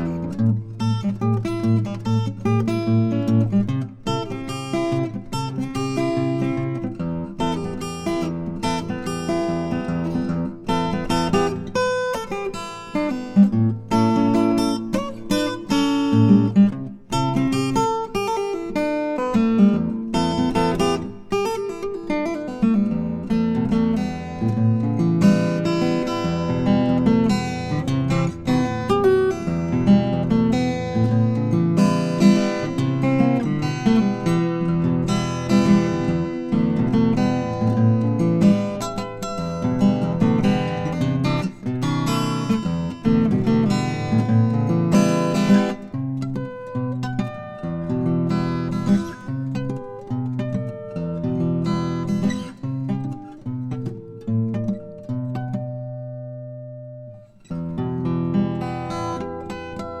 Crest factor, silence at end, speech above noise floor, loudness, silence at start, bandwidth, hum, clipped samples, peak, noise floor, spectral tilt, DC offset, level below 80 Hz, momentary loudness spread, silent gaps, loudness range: 18 dB; 0 s; 21 dB; -21 LUFS; 0 s; 12.5 kHz; none; under 0.1%; -4 dBFS; -41 dBFS; -7 dB/octave; under 0.1%; -44 dBFS; 11 LU; none; 6 LU